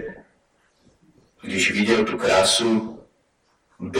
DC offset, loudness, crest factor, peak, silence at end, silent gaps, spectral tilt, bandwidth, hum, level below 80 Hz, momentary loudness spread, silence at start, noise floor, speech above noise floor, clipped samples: under 0.1%; -19 LUFS; 20 dB; -4 dBFS; 0 s; none; -3 dB/octave; 16 kHz; none; -56 dBFS; 21 LU; 0 s; -65 dBFS; 46 dB; under 0.1%